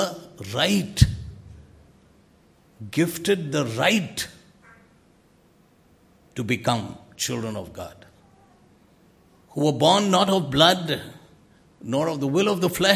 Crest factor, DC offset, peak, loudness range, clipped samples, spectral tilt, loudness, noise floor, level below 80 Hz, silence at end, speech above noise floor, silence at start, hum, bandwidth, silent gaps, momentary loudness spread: 24 dB; under 0.1%; 0 dBFS; 9 LU; under 0.1%; -4.5 dB/octave; -22 LUFS; -58 dBFS; -40 dBFS; 0 s; 36 dB; 0 s; none; 16 kHz; none; 20 LU